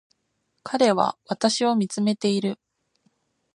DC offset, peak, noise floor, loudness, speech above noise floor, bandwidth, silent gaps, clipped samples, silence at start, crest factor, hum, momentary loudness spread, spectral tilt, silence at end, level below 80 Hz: under 0.1%; -4 dBFS; -74 dBFS; -23 LUFS; 52 dB; 11 kHz; none; under 0.1%; 0.65 s; 20 dB; none; 11 LU; -4.5 dB/octave; 1 s; -72 dBFS